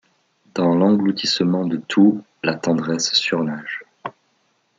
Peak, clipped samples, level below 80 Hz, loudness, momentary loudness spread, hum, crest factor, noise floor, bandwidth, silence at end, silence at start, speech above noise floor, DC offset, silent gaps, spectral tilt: -4 dBFS; under 0.1%; -68 dBFS; -19 LUFS; 15 LU; none; 16 dB; -65 dBFS; 9 kHz; 0.7 s; 0.55 s; 46 dB; under 0.1%; none; -4.5 dB/octave